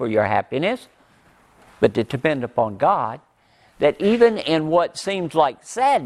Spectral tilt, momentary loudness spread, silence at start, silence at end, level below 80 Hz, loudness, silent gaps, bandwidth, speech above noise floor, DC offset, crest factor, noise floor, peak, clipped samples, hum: -5.5 dB/octave; 7 LU; 0 s; 0 s; -56 dBFS; -20 LUFS; none; 12.5 kHz; 37 dB; under 0.1%; 20 dB; -57 dBFS; 0 dBFS; under 0.1%; none